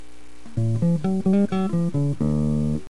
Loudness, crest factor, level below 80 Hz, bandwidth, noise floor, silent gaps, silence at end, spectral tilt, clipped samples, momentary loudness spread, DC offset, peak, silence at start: -23 LUFS; 12 dB; -42 dBFS; 11.5 kHz; -47 dBFS; none; 0.1 s; -9 dB/octave; under 0.1%; 4 LU; 3%; -10 dBFS; 0.45 s